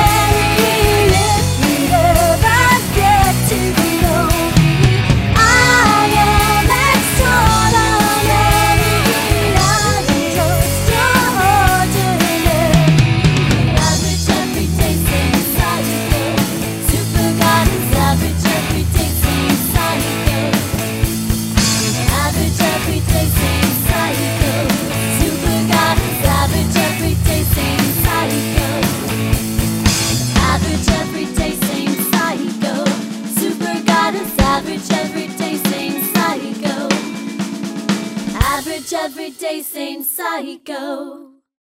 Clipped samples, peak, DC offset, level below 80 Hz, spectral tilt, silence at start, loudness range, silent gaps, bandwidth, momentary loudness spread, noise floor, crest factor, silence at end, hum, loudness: under 0.1%; 0 dBFS; under 0.1%; -24 dBFS; -4.5 dB/octave; 0 s; 7 LU; none; 16.5 kHz; 9 LU; -37 dBFS; 14 dB; 0.4 s; none; -14 LUFS